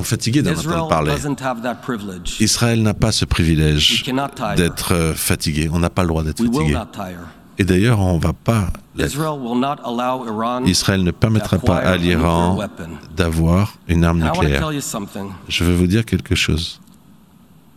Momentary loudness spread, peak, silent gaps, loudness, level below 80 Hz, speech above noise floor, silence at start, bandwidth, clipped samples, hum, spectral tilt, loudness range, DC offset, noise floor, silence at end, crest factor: 10 LU; 0 dBFS; none; -18 LUFS; -34 dBFS; 30 dB; 0 s; 16 kHz; under 0.1%; none; -5 dB/octave; 2 LU; 0.2%; -48 dBFS; 1 s; 18 dB